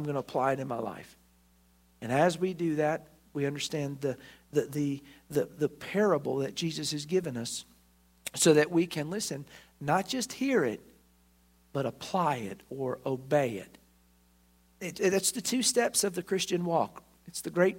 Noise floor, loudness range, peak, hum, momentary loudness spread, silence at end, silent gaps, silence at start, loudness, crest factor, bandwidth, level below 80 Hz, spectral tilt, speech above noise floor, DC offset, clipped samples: -64 dBFS; 4 LU; -10 dBFS; none; 13 LU; 0 s; none; 0 s; -30 LUFS; 22 dB; 16 kHz; -68 dBFS; -4 dB/octave; 34 dB; under 0.1%; under 0.1%